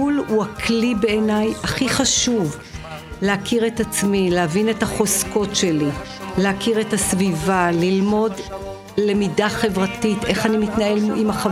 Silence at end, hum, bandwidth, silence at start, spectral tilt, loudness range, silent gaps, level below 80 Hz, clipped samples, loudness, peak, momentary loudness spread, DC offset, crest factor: 0 s; none; 16 kHz; 0 s; -4 dB/octave; 1 LU; none; -42 dBFS; under 0.1%; -19 LUFS; -4 dBFS; 6 LU; under 0.1%; 16 dB